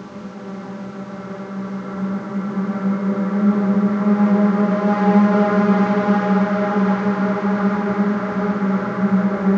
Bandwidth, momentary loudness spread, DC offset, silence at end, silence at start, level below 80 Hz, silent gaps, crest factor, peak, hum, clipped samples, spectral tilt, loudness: 6.6 kHz; 16 LU; under 0.1%; 0 s; 0 s; -62 dBFS; none; 16 dB; -2 dBFS; none; under 0.1%; -9 dB/octave; -18 LUFS